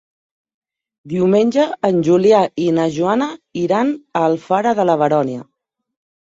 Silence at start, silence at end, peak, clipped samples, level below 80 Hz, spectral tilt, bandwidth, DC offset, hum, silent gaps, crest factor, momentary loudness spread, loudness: 1.05 s; 0.85 s; -2 dBFS; under 0.1%; -60 dBFS; -7 dB/octave; 7.8 kHz; under 0.1%; none; none; 14 dB; 8 LU; -16 LUFS